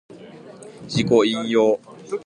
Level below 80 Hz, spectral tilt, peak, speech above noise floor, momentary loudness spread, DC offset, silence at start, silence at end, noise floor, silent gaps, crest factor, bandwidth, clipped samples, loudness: -56 dBFS; -5.5 dB/octave; -4 dBFS; 23 dB; 23 LU; under 0.1%; 0.1 s; 0.05 s; -41 dBFS; none; 18 dB; 10.5 kHz; under 0.1%; -20 LUFS